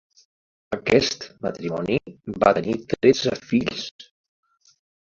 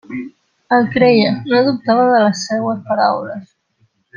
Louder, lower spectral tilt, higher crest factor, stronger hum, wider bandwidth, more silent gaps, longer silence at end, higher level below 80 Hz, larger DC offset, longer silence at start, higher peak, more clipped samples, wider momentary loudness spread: second, -23 LUFS vs -14 LUFS; about the same, -5 dB/octave vs -5.5 dB/octave; first, 22 dB vs 14 dB; neither; second, 7.6 kHz vs 9.2 kHz; first, 3.91-3.99 s vs none; first, 1.05 s vs 0.7 s; about the same, -54 dBFS vs -58 dBFS; neither; first, 0.7 s vs 0.1 s; about the same, -2 dBFS vs -2 dBFS; neither; second, 13 LU vs 17 LU